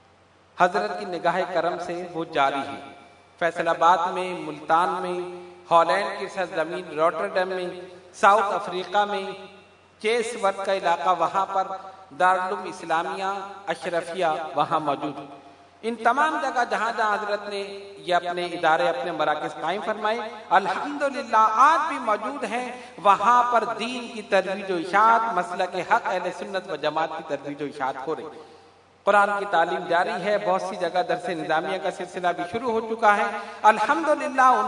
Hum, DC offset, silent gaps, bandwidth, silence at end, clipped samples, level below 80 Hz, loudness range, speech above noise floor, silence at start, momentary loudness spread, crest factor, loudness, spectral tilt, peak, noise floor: none; under 0.1%; none; 11 kHz; 0 s; under 0.1%; -76 dBFS; 4 LU; 33 dB; 0.55 s; 12 LU; 22 dB; -24 LUFS; -4 dB/octave; -2 dBFS; -56 dBFS